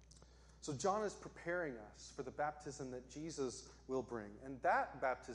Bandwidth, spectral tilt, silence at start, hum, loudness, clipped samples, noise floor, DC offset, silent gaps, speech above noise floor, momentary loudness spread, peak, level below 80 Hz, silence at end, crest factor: 11.5 kHz; -4.5 dB/octave; 0 s; none; -43 LUFS; under 0.1%; -63 dBFS; under 0.1%; none; 20 dB; 14 LU; -24 dBFS; -66 dBFS; 0 s; 20 dB